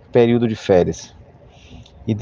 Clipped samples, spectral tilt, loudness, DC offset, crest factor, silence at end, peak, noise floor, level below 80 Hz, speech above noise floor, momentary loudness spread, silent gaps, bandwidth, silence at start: under 0.1%; -7 dB/octave; -17 LUFS; under 0.1%; 18 dB; 0 s; -2 dBFS; -45 dBFS; -48 dBFS; 29 dB; 17 LU; none; 7.4 kHz; 0.15 s